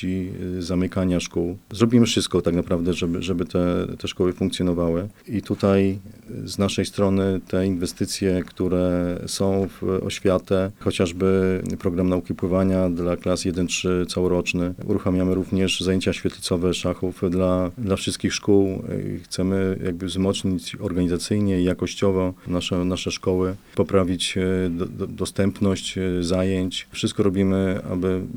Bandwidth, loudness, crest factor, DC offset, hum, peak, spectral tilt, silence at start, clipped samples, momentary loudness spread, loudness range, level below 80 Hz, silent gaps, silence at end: 19 kHz; -23 LUFS; 20 dB; 0.4%; none; -2 dBFS; -6 dB/octave; 0 s; under 0.1%; 6 LU; 1 LU; -48 dBFS; none; 0 s